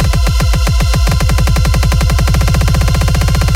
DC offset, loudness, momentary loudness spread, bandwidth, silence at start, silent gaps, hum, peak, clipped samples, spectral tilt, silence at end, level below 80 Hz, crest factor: under 0.1%; -12 LUFS; 1 LU; 16.5 kHz; 0 s; none; none; -2 dBFS; under 0.1%; -5 dB/octave; 0 s; -12 dBFS; 8 dB